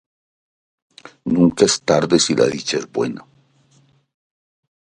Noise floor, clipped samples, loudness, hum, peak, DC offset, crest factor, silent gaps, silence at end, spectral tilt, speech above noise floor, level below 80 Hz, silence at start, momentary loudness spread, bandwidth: -57 dBFS; under 0.1%; -17 LUFS; none; 0 dBFS; under 0.1%; 20 dB; none; 1.75 s; -4 dB/octave; 40 dB; -54 dBFS; 1.25 s; 11 LU; 11.5 kHz